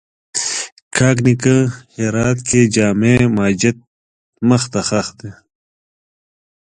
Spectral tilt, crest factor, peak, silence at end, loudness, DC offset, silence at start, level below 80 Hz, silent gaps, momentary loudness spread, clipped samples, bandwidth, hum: -5 dB/octave; 16 dB; 0 dBFS; 1.35 s; -15 LUFS; under 0.1%; 0.35 s; -44 dBFS; 0.72-0.91 s, 3.87-4.33 s; 10 LU; under 0.1%; 11 kHz; none